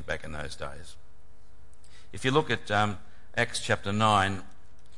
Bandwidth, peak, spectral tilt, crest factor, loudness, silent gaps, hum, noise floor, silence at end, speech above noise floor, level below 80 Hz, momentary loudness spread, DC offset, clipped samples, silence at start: 11.5 kHz; -10 dBFS; -4.5 dB/octave; 22 dB; -28 LUFS; none; none; -58 dBFS; 0.5 s; 29 dB; -54 dBFS; 17 LU; 2%; under 0.1%; 0 s